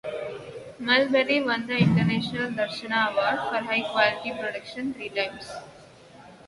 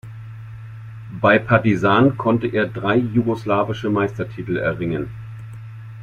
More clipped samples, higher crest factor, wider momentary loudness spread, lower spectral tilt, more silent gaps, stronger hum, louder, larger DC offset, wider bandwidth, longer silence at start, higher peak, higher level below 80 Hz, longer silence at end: neither; about the same, 22 dB vs 18 dB; second, 14 LU vs 21 LU; second, -6 dB/octave vs -8 dB/octave; neither; neither; second, -25 LUFS vs -19 LUFS; neither; first, 11.5 kHz vs 7.2 kHz; about the same, 0.05 s vs 0.05 s; about the same, -4 dBFS vs -2 dBFS; second, -60 dBFS vs -50 dBFS; about the same, 0.1 s vs 0 s